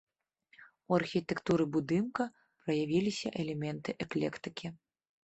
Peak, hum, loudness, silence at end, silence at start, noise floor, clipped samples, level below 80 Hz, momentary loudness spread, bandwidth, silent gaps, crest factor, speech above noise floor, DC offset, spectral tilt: -14 dBFS; none; -34 LUFS; 0.5 s; 0.6 s; -70 dBFS; under 0.1%; -68 dBFS; 11 LU; 8.4 kHz; none; 20 dB; 36 dB; under 0.1%; -6.5 dB/octave